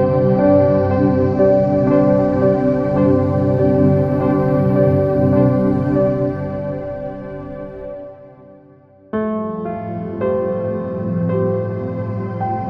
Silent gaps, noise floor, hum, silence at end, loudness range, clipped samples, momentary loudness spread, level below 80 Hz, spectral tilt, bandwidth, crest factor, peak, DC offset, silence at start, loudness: none; -46 dBFS; none; 0 s; 12 LU; under 0.1%; 13 LU; -42 dBFS; -11.5 dB/octave; 5.6 kHz; 14 dB; -2 dBFS; under 0.1%; 0 s; -17 LUFS